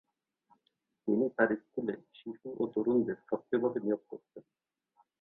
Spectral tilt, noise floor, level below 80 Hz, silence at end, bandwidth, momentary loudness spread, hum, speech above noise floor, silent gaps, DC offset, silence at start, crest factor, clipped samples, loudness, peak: -10 dB/octave; -80 dBFS; -78 dBFS; 0.8 s; 4 kHz; 15 LU; none; 47 dB; none; under 0.1%; 1.05 s; 22 dB; under 0.1%; -33 LUFS; -12 dBFS